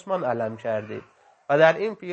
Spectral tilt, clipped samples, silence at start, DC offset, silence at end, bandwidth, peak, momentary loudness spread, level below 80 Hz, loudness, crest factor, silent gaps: -6.5 dB/octave; under 0.1%; 0.05 s; under 0.1%; 0 s; 7.4 kHz; -4 dBFS; 15 LU; -74 dBFS; -23 LUFS; 22 dB; none